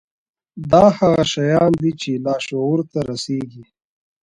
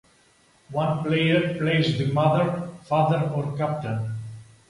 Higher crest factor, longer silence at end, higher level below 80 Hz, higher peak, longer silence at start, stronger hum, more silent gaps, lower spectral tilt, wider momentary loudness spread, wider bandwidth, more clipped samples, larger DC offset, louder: about the same, 18 dB vs 18 dB; first, 0.6 s vs 0.25 s; first, -48 dBFS vs -58 dBFS; first, 0 dBFS vs -6 dBFS; second, 0.55 s vs 0.7 s; neither; neither; second, -6 dB/octave vs -7.5 dB/octave; about the same, 12 LU vs 11 LU; about the same, 11 kHz vs 11 kHz; neither; neither; first, -17 LUFS vs -24 LUFS